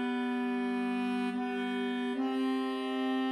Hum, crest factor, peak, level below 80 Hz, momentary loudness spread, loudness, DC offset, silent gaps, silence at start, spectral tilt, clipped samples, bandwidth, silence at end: none; 10 dB; -24 dBFS; -78 dBFS; 2 LU; -33 LUFS; under 0.1%; none; 0 s; -5.5 dB/octave; under 0.1%; 11 kHz; 0 s